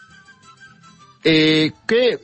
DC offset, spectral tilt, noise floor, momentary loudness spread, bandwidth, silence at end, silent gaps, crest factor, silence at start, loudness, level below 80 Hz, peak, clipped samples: under 0.1%; -5.5 dB/octave; -48 dBFS; 5 LU; 8.6 kHz; 0.05 s; none; 16 dB; 1.25 s; -16 LUFS; -58 dBFS; -4 dBFS; under 0.1%